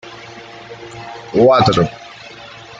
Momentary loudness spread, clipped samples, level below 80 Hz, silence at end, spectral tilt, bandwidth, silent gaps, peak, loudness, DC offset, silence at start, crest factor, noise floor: 23 LU; under 0.1%; -48 dBFS; 0.35 s; -6.5 dB/octave; 9 kHz; none; -2 dBFS; -13 LUFS; under 0.1%; 0.05 s; 16 dB; -36 dBFS